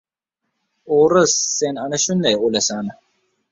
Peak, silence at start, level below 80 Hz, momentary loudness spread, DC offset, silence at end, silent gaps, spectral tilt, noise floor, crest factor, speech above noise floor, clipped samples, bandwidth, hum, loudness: -2 dBFS; 0.85 s; -60 dBFS; 8 LU; under 0.1%; 0.6 s; none; -3 dB/octave; -78 dBFS; 18 dB; 61 dB; under 0.1%; 7.8 kHz; none; -17 LUFS